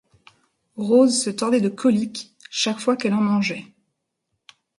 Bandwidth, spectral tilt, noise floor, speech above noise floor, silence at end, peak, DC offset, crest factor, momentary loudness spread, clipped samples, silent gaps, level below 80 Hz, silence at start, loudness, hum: 11.5 kHz; -4.5 dB/octave; -77 dBFS; 57 dB; 1.15 s; -4 dBFS; under 0.1%; 18 dB; 14 LU; under 0.1%; none; -68 dBFS; 0.75 s; -21 LUFS; none